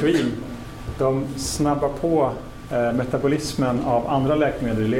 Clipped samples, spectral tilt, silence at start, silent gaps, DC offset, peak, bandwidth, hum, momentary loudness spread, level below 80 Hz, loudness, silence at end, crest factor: under 0.1%; -6 dB/octave; 0 s; none; 0.2%; -8 dBFS; 16.5 kHz; none; 9 LU; -40 dBFS; -22 LUFS; 0 s; 14 dB